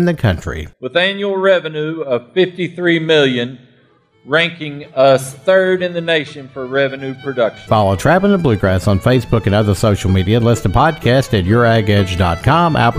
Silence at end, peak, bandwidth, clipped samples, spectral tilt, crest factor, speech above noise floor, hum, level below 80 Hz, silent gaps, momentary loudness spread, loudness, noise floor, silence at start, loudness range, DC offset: 0 s; 0 dBFS; 15.5 kHz; under 0.1%; -6.5 dB/octave; 14 dB; 39 dB; none; -36 dBFS; none; 9 LU; -14 LUFS; -53 dBFS; 0 s; 3 LU; under 0.1%